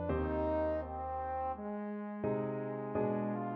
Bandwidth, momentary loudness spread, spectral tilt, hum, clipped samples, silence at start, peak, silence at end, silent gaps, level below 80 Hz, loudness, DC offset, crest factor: 4.9 kHz; 6 LU; -8 dB/octave; none; under 0.1%; 0 s; -22 dBFS; 0 s; none; -50 dBFS; -37 LUFS; under 0.1%; 14 dB